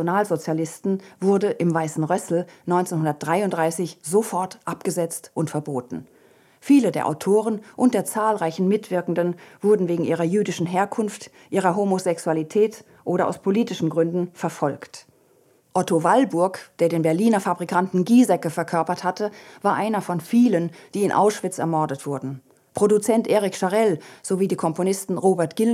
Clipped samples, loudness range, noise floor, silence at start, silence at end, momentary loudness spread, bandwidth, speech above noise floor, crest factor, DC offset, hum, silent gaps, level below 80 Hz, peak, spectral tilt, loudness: under 0.1%; 3 LU; -59 dBFS; 0 s; 0 s; 9 LU; 15.5 kHz; 37 dB; 18 dB; under 0.1%; none; none; -72 dBFS; -4 dBFS; -6 dB/octave; -22 LUFS